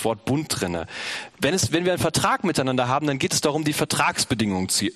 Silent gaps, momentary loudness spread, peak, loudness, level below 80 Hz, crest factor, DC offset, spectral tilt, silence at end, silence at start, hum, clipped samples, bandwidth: none; 6 LU; -4 dBFS; -23 LUFS; -52 dBFS; 20 dB; under 0.1%; -3.5 dB/octave; 0 s; 0 s; none; under 0.1%; 13.5 kHz